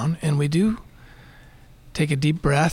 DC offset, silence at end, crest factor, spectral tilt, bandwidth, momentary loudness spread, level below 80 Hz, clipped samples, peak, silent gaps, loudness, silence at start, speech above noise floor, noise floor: under 0.1%; 0 s; 16 dB; -6.5 dB/octave; 12 kHz; 10 LU; -42 dBFS; under 0.1%; -8 dBFS; none; -22 LUFS; 0 s; 27 dB; -48 dBFS